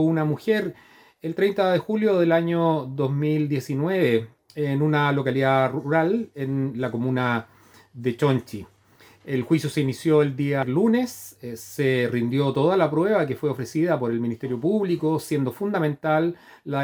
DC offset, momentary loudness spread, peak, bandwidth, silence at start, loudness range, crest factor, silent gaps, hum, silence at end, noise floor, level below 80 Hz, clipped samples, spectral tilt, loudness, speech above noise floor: under 0.1%; 9 LU; -6 dBFS; over 20 kHz; 0 s; 3 LU; 16 dB; none; none; 0 s; -54 dBFS; -66 dBFS; under 0.1%; -7 dB/octave; -23 LUFS; 32 dB